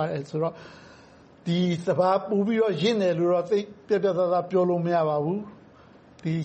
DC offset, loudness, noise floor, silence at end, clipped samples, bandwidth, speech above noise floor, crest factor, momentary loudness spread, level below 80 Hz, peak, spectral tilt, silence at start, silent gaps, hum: under 0.1%; -25 LUFS; -52 dBFS; 0 s; under 0.1%; 8.4 kHz; 28 dB; 16 dB; 8 LU; -66 dBFS; -10 dBFS; -7 dB/octave; 0 s; none; none